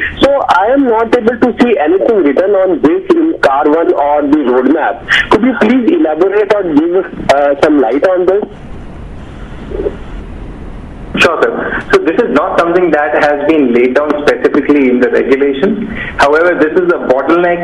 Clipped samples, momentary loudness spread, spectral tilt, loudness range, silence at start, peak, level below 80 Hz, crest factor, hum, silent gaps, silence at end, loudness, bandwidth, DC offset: 0.5%; 18 LU; -6 dB/octave; 5 LU; 0 s; 0 dBFS; -34 dBFS; 10 dB; none; none; 0 s; -10 LUFS; 11.5 kHz; 0.4%